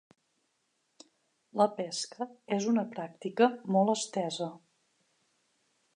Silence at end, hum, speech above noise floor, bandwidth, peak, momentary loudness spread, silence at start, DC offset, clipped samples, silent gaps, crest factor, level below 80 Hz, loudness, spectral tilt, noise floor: 1.4 s; none; 47 dB; 11 kHz; -12 dBFS; 12 LU; 1.55 s; under 0.1%; under 0.1%; none; 22 dB; -88 dBFS; -31 LUFS; -5 dB/octave; -77 dBFS